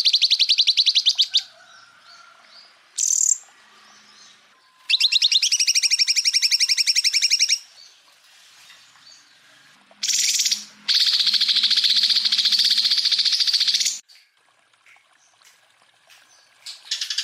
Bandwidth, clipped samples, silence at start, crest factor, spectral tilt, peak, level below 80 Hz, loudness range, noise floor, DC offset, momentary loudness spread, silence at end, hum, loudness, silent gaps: 16 kHz; under 0.1%; 0 s; 16 dB; 5.5 dB/octave; -6 dBFS; under -90 dBFS; 9 LU; -61 dBFS; under 0.1%; 8 LU; 0 s; none; -17 LUFS; none